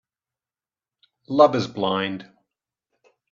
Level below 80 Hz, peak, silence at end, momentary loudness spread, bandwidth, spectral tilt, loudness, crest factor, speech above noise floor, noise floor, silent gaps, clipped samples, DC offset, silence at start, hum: -68 dBFS; -2 dBFS; 1.1 s; 12 LU; 7.2 kHz; -6 dB/octave; -21 LUFS; 24 dB; over 70 dB; under -90 dBFS; none; under 0.1%; under 0.1%; 1.3 s; none